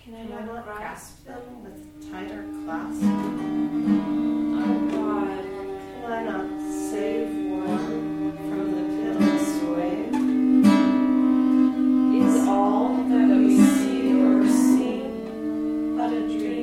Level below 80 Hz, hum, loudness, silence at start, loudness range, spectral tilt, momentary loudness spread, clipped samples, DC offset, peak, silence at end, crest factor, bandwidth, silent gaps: -56 dBFS; none; -22 LUFS; 0.05 s; 9 LU; -6 dB/octave; 17 LU; under 0.1%; under 0.1%; -4 dBFS; 0 s; 18 dB; 14 kHz; none